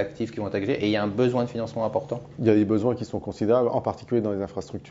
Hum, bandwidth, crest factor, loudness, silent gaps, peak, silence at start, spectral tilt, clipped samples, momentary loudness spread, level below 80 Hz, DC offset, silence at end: none; 7.8 kHz; 18 dB; -25 LUFS; none; -6 dBFS; 0 s; -7.5 dB/octave; under 0.1%; 9 LU; -58 dBFS; under 0.1%; 0 s